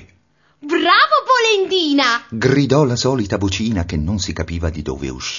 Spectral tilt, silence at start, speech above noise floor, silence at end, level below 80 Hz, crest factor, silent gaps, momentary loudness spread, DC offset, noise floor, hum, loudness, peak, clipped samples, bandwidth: -4.5 dB/octave; 0 s; 40 dB; 0 s; -36 dBFS; 16 dB; none; 11 LU; under 0.1%; -58 dBFS; none; -16 LUFS; 0 dBFS; under 0.1%; 7.4 kHz